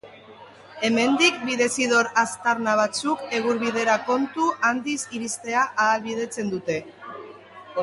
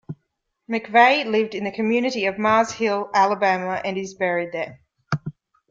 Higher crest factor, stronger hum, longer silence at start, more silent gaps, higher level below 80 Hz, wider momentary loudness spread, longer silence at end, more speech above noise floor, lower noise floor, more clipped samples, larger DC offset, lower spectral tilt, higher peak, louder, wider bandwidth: about the same, 20 dB vs 20 dB; neither; about the same, 0.05 s vs 0.1 s; neither; about the same, -68 dBFS vs -64 dBFS; second, 10 LU vs 14 LU; second, 0 s vs 0.4 s; second, 23 dB vs 55 dB; second, -46 dBFS vs -75 dBFS; neither; neither; second, -3 dB/octave vs -5 dB/octave; about the same, -4 dBFS vs -2 dBFS; about the same, -23 LUFS vs -21 LUFS; first, 11.5 kHz vs 7.8 kHz